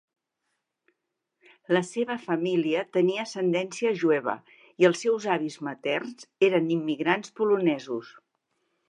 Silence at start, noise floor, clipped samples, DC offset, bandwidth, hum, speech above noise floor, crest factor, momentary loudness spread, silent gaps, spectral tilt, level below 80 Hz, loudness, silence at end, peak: 1.7 s; -82 dBFS; under 0.1%; under 0.1%; 10.5 kHz; none; 56 dB; 20 dB; 9 LU; none; -5.5 dB/octave; -82 dBFS; -26 LUFS; 0.8 s; -8 dBFS